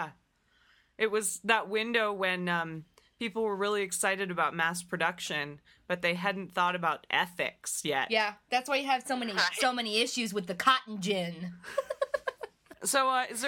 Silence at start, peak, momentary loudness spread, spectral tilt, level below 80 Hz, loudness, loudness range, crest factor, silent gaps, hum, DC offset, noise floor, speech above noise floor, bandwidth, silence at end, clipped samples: 0 s; -10 dBFS; 9 LU; -2.5 dB/octave; -72 dBFS; -30 LUFS; 2 LU; 22 dB; none; none; under 0.1%; -69 dBFS; 38 dB; 17.5 kHz; 0 s; under 0.1%